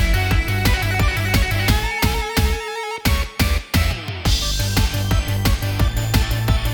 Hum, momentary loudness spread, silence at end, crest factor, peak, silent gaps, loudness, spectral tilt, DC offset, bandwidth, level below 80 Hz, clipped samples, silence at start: none; 3 LU; 0 s; 16 dB; -4 dBFS; none; -20 LUFS; -4.5 dB/octave; under 0.1%; over 20 kHz; -22 dBFS; under 0.1%; 0 s